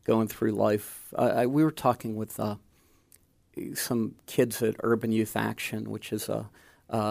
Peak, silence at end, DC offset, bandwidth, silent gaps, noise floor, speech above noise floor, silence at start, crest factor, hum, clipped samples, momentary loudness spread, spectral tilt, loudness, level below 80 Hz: -8 dBFS; 0 s; under 0.1%; 15.5 kHz; none; -62 dBFS; 34 dB; 0.1 s; 20 dB; none; under 0.1%; 11 LU; -5.5 dB/octave; -29 LUFS; -64 dBFS